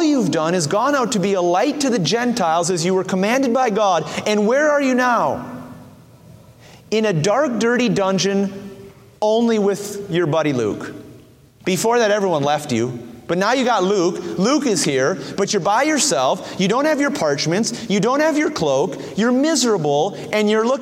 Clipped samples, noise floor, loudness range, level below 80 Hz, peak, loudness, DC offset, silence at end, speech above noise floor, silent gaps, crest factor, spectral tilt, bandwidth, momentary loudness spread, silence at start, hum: under 0.1%; -46 dBFS; 3 LU; -60 dBFS; -4 dBFS; -18 LUFS; under 0.1%; 0 s; 28 dB; none; 14 dB; -4.5 dB/octave; 16 kHz; 7 LU; 0 s; none